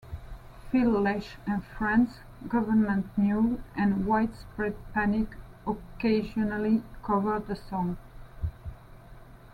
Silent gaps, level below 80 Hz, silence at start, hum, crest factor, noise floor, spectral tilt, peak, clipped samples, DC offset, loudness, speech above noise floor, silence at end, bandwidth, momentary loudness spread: none; -46 dBFS; 0.05 s; none; 16 dB; -49 dBFS; -8.5 dB/octave; -14 dBFS; under 0.1%; under 0.1%; -29 LUFS; 21 dB; 0.05 s; 5.6 kHz; 13 LU